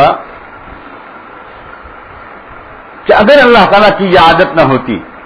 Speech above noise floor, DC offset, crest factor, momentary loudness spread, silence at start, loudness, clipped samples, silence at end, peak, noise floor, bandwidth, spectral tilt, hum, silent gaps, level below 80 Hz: 25 dB; under 0.1%; 10 dB; 26 LU; 0 s; -6 LUFS; 2%; 0.05 s; 0 dBFS; -31 dBFS; 5.4 kHz; -7 dB/octave; none; none; -36 dBFS